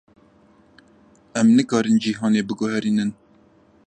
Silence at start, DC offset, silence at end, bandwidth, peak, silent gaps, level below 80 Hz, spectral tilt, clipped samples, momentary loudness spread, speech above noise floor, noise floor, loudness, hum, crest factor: 1.35 s; under 0.1%; 0.75 s; 9.4 kHz; -6 dBFS; none; -64 dBFS; -5.5 dB/octave; under 0.1%; 8 LU; 36 dB; -55 dBFS; -20 LUFS; none; 16 dB